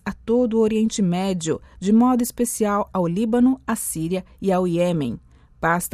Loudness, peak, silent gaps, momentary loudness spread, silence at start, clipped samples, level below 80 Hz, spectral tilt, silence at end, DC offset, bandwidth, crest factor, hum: -21 LUFS; -8 dBFS; none; 7 LU; 0.05 s; under 0.1%; -48 dBFS; -5.5 dB/octave; 0.05 s; under 0.1%; 15 kHz; 14 dB; none